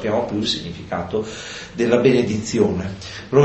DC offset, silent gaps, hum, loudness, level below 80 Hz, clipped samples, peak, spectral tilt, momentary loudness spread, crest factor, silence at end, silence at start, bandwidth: under 0.1%; none; none; -21 LUFS; -44 dBFS; under 0.1%; -2 dBFS; -5.5 dB/octave; 14 LU; 18 dB; 0 s; 0 s; 8.4 kHz